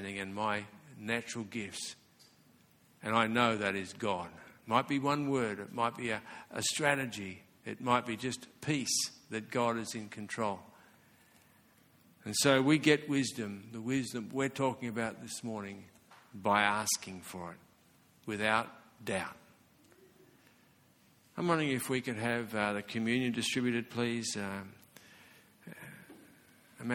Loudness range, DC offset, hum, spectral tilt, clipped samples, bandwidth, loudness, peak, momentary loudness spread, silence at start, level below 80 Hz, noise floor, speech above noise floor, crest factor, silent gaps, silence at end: 7 LU; under 0.1%; none; -4 dB/octave; under 0.1%; 18 kHz; -34 LUFS; -12 dBFS; 17 LU; 0 s; -72 dBFS; -66 dBFS; 32 dB; 24 dB; none; 0 s